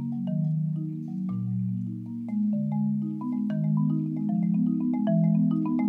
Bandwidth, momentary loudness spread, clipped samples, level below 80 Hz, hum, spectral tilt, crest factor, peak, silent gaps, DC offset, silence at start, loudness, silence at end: 3.2 kHz; 8 LU; under 0.1%; -72 dBFS; none; -12 dB/octave; 12 dB; -14 dBFS; none; under 0.1%; 0 s; -27 LUFS; 0 s